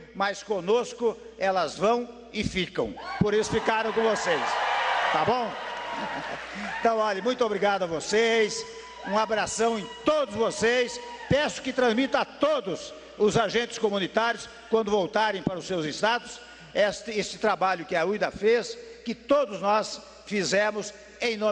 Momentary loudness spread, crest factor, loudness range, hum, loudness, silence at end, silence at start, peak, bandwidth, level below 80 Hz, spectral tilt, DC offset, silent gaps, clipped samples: 10 LU; 18 dB; 2 LU; none; -26 LUFS; 0 s; 0 s; -8 dBFS; 10.5 kHz; -56 dBFS; -4 dB/octave; under 0.1%; none; under 0.1%